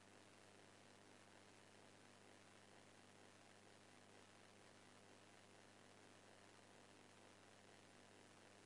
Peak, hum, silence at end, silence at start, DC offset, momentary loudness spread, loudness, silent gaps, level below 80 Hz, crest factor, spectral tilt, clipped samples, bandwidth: -50 dBFS; 50 Hz at -75 dBFS; 0 s; 0 s; under 0.1%; 0 LU; -67 LUFS; none; under -90 dBFS; 16 dB; -3 dB/octave; under 0.1%; 11 kHz